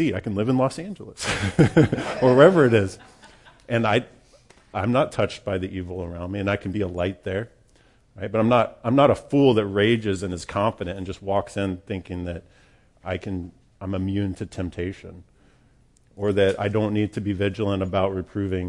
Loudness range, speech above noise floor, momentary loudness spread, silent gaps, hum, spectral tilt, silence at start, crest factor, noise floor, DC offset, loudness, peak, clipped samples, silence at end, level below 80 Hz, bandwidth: 11 LU; 35 dB; 14 LU; none; none; -6.5 dB/octave; 0 s; 20 dB; -58 dBFS; under 0.1%; -23 LUFS; -2 dBFS; under 0.1%; 0 s; -52 dBFS; 11.5 kHz